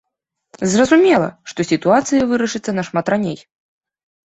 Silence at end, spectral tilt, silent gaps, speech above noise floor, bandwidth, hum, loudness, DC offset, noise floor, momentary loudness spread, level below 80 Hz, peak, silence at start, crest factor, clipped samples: 0.95 s; -5 dB/octave; none; 61 dB; 8.2 kHz; none; -16 LUFS; under 0.1%; -77 dBFS; 12 LU; -54 dBFS; -2 dBFS; 0.6 s; 16 dB; under 0.1%